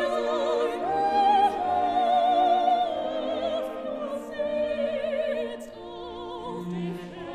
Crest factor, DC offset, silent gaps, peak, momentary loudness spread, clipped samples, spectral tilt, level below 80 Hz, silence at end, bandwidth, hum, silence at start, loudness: 14 dB; 0.1%; none; -12 dBFS; 14 LU; under 0.1%; -5.5 dB/octave; -60 dBFS; 0 s; 12.5 kHz; none; 0 s; -26 LUFS